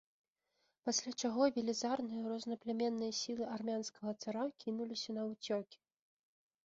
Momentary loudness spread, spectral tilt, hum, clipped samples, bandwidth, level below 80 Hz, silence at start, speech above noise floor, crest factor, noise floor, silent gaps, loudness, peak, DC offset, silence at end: 8 LU; -3.5 dB/octave; none; under 0.1%; 7.6 kHz; -82 dBFS; 0.85 s; 44 dB; 20 dB; -83 dBFS; none; -39 LUFS; -20 dBFS; under 0.1%; 0.9 s